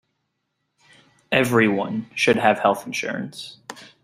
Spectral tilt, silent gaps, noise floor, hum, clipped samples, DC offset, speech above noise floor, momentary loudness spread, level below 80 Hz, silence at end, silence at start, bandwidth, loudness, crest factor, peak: -5 dB/octave; none; -76 dBFS; none; under 0.1%; under 0.1%; 55 dB; 19 LU; -62 dBFS; 0.2 s; 1.3 s; 16 kHz; -21 LUFS; 22 dB; -2 dBFS